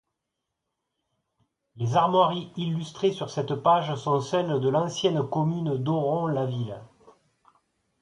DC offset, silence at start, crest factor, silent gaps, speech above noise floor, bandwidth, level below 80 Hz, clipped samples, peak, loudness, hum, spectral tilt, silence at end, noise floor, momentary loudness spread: under 0.1%; 1.75 s; 20 dB; none; 58 dB; 11 kHz; -66 dBFS; under 0.1%; -8 dBFS; -26 LUFS; none; -6.5 dB/octave; 1.15 s; -83 dBFS; 9 LU